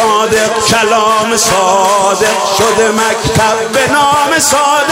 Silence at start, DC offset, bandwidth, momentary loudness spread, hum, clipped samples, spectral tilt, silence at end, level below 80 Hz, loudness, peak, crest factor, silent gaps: 0 s; under 0.1%; 16.5 kHz; 2 LU; none; under 0.1%; -2.5 dB/octave; 0 s; -40 dBFS; -9 LUFS; 0 dBFS; 10 dB; none